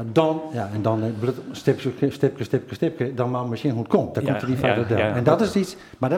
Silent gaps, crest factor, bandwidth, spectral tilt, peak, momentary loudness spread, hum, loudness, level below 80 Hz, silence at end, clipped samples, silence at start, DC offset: none; 20 dB; 15.5 kHz; -7.5 dB/octave; -2 dBFS; 7 LU; none; -23 LUFS; -56 dBFS; 0 s; under 0.1%; 0 s; under 0.1%